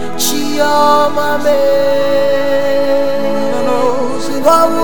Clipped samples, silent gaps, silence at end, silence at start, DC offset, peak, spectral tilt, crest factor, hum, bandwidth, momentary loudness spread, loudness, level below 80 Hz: under 0.1%; none; 0 s; 0 s; 10%; 0 dBFS; -3.5 dB/octave; 14 dB; none; 19.5 kHz; 6 LU; -13 LUFS; -56 dBFS